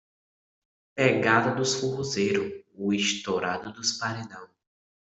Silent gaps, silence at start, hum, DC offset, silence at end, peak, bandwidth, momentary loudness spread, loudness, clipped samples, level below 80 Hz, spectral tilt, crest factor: none; 0.95 s; none; under 0.1%; 0.65 s; -8 dBFS; 8.2 kHz; 14 LU; -26 LUFS; under 0.1%; -68 dBFS; -3.5 dB/octave; 22 dB